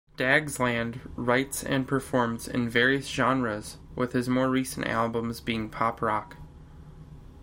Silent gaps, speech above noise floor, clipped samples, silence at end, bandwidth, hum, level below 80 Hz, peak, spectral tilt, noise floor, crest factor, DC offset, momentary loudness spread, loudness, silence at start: none; 20 dB; under 0.1%; 0 s; 16.5 kHz; none; -50 dBFS; -6 dBFS; -5 dB/octave; -47 dBFS; 22 dB; under 0.1%; 9 LU; -27 LUFS; 0.2 s